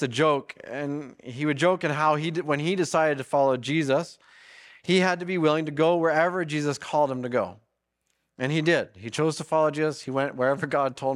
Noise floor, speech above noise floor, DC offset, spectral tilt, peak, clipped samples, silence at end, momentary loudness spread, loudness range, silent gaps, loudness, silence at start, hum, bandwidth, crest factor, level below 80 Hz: -76 dBFS; 52 dB; under 0.1%; -5.5 dB/octave; -8 dBFS; under 0.1%; 0 s; 9 LU; 2 LU; none; -25 LUFS; 0 s; none; 12.5 kHz; 18 dB; -72 dBFS